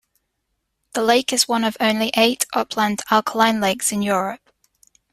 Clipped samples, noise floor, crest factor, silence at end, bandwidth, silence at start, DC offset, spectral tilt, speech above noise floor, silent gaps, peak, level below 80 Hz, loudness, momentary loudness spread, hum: under 0.1%; -74 dBFS; 18 dB; 0.75 s; 15.5 kHz; 0.95 s; under 0.1%; -2.5 dB/octave; 55 dB; none; -2 dBFS; -60 dBFS; -19 LUFS; 6 LU; none